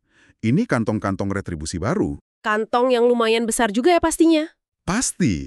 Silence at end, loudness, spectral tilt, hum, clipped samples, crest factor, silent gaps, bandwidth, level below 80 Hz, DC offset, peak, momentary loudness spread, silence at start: 0 s; -20 LUFS; -5 dB/octave; none; under 0.1%; 16 dB; 2.21-2.41 s; 13.5 kHz; -44 dBFS; under 0.1%; -4 dBFS; 10 LU; 0.45 s